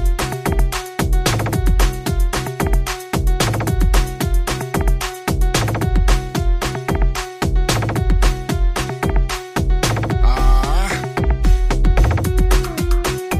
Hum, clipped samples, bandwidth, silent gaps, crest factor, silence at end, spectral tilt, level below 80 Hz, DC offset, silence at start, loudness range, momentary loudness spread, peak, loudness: none; under 0.1%; 15 kHz; none; 14 dB; 0 s; -5 dB/octave; -18 dBFS; under 0.1%; 0 s; 2 LU; 4 LU; -2 dBFS; -19 LUFS